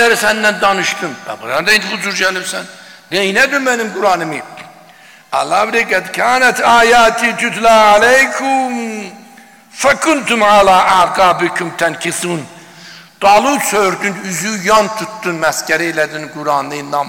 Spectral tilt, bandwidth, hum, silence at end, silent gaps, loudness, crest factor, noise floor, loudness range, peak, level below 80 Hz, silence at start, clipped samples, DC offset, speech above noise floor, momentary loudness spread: -2.5 dB/octave; 17 kHz; none; 0 s; none; -12 LUFS; 10 dB; -41 dBFS; 5 LU; -2 dBFS; -46 dBFS; 0 s; under 0.1%; 0.3%; 29 dB; 13 LU